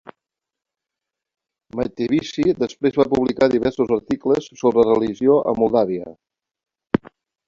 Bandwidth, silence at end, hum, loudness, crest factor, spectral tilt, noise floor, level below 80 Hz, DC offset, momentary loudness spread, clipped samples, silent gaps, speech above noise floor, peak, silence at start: 7.4 kHz; 0.5 s; none; -19 LUFS; 18 dB; -7 dB/octave; -86 dBFS; -52 dBFS; under 0.1%; 8 LU; under 0.1%; none; 67 dB; -2 dBFS; 1.75 s